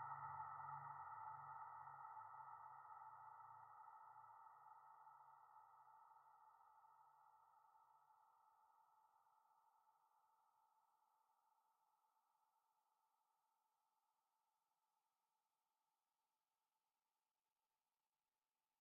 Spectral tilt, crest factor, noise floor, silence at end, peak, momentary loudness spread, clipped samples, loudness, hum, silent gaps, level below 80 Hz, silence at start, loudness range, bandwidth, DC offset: 0 dB/octave; 22 dB; under -90 dBFS; 6.2 s; -42 dBFS; 14 LU; under 0.1%; -59 LUFS; none; none; under -90 dBFS; 0 s; 11 LU; 2.1 kHz; under 0.1%